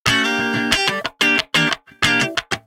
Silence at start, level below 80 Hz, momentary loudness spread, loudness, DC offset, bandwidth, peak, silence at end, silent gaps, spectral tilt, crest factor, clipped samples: 0.05 s; -46 dBFS; 4 LU; -17 LUFS; under 0.1%; 17 kHz; 0 dBFS; 0.05 s; none; -2.5 dB/octave; 20 dB; under 0.1%